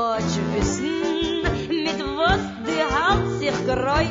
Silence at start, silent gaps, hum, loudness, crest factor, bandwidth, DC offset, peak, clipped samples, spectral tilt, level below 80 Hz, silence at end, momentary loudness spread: 0 s; none; none; -22 LUFS; 18 dB; 7.6 kHz; under 0.1%; -4 dBFS; under 0.1%; -5 dB/octave; -36 dBFS; 0 s; 4 LU